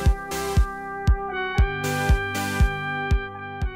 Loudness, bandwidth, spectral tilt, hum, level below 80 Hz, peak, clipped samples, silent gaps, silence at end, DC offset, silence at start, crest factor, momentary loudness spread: -25 LUFS; 16 kHz; -5.5 dB/octave; none; -26 dBFS; -10 dBFS; under 0.1%; none; 0 s; under 0.1%; 0 s; 12 dB; 5 LU